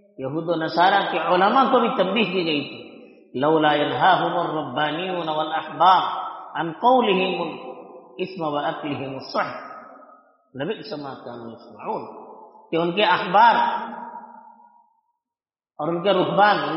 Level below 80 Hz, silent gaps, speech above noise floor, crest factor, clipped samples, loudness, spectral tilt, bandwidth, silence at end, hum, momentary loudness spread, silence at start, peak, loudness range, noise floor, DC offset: -70 dBFS; none; over 69 dB; 18 dB; under 0.1%; -21 LUFS; -2.5 dB/octave; 6 kHz; 0 s; none; 19 LU; 0.2 s; -4 dBFS; 10 LU; under -90 dBFS; under 0.1%